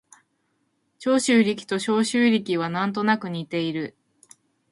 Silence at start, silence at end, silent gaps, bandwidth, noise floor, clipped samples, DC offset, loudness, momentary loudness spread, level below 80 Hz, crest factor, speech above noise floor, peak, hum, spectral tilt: 1 s; 0.8 s; none; 11.5 kHz; -71 dBFS; under 0.1%; under 0.1%; -23 LUFS; 9 LU; -70 dBFS; 18 dB; 49 dB; -6 dBFS; none; -4.5 dB/octave